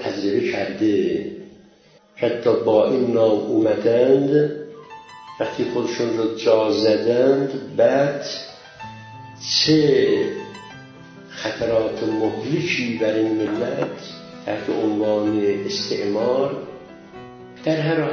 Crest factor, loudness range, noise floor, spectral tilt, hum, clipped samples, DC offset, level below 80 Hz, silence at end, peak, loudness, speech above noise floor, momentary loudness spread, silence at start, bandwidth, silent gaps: 18 dB; 4 LU; -53 dBFS; -5.5 dB/octave; none; under 0.1%; under 0.1%; -58 dBFS; 0 s; -4 dBFS; -20 LUFS; 33 dB; 21 LU; 0 s; 7.2 kHz; none